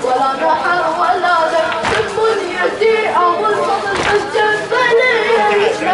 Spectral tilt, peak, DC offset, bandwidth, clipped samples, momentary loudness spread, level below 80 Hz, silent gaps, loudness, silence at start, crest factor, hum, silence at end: -3.5 dB/octave; -2 dBFS; under 0.1%; 11.5 kHz; under 0.1%; 4 LU; -48 dBFS; none; -14 LUFS; 0 s; 12 dB; none; 0 s